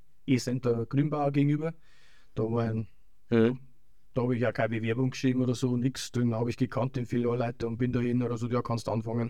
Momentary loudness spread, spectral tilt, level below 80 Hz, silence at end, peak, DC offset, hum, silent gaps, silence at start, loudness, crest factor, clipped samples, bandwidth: 6 LU; -7 dB/octave; -58 dBFS; 0 s; -12 dBFS; 0.4%; none; none; 0.25 s; -29 LUFS; 16 dB; under 0.1%; 13 kHz